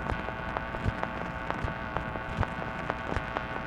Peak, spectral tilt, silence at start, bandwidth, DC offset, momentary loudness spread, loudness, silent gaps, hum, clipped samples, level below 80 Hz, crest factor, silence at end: -8 dBFS; -6.5 dB/octave; 0 s; 11.5 kHz; under 0.1%; 2 LU; -34 LUFS; none; none; under 0.1%; -42 dBFS; 26 dB; 0 s